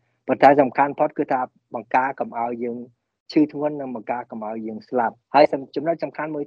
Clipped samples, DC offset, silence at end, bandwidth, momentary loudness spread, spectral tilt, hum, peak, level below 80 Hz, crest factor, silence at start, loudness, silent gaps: under 0.1%; under 0.1%; 0 s; 7 kHz; 14 LU; -7.5 dB/octave; none; 0 dBFS; -70 dBFS; 22 dB; 0.25 s; -22 LUFS; 3.20-3.26 s